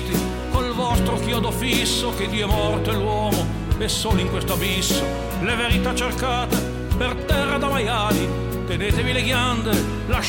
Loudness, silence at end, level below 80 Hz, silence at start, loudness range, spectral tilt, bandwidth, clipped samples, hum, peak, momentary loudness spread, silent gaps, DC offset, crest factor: -21 LUFS; 0 s; -30 dBFS; 0 s; 1 LU; -4.5 dB/octave; 17 kHz; under 0.1%; none; -6 dBFS; 4 LU; none; under 0.1%; 14 dB